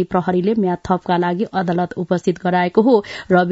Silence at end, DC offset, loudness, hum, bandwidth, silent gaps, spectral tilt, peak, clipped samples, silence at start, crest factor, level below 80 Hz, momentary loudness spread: 0 s; under 0.1%; -18 LUFS; none; 8 kHz; none; -7.5 dB/octave; -2 dBFS; under 0.1%; 0 s; 16 dB; -50 dBFS; 6 LU